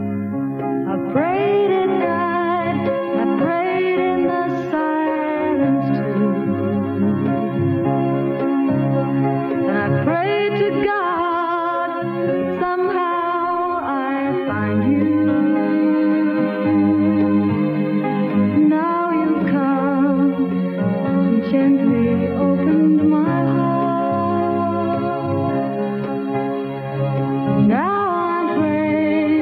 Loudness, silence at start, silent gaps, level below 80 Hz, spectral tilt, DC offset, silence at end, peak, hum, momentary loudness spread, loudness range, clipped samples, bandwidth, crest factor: -19 LUFS; 0 s; none; -56 dBFS; -10 dB/octave; under 0.1%; 0 s; -6 dBFS; none; 5 LU; 3 LU; under 0.1%; 4.9 kHz; 12 dB